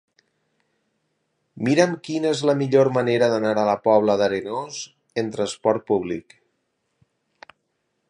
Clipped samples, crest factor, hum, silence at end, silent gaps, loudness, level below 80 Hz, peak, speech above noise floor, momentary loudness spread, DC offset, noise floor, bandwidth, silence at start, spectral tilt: under 0.1%; 22 dB; none; 1.9 s; none; -21 LUFS; -64 dBFS; -2 dBFS; 53 dB; 12 LU; under 0.1%; -74 dBFS; 10.5 kHz; 1.55 s; -5.5 dB/octave